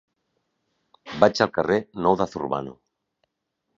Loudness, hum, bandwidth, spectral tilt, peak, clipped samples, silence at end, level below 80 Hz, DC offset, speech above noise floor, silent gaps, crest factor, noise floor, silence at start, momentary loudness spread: -23 LUFS; none; 7.6 kHz; -5.5 dB/octave; 0 dBFS; under 0.1%; 1.05 s; -58 dBFS; under 0.1%; 57 dB; none; 24 dB; -79 dBFS; 1.05 s; 13 LU